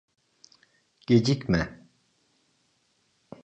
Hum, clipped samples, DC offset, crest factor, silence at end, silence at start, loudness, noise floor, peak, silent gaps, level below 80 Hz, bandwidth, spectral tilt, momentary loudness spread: none; under 0.1%; under 0.1%; 22 dB; 1.7 s; 1.1 s; -25 LUFS; -70 dBFS; -8 dBFS; none; -50 dBFS; 8.8 kHz; -6.5 dB/octave; 15 LU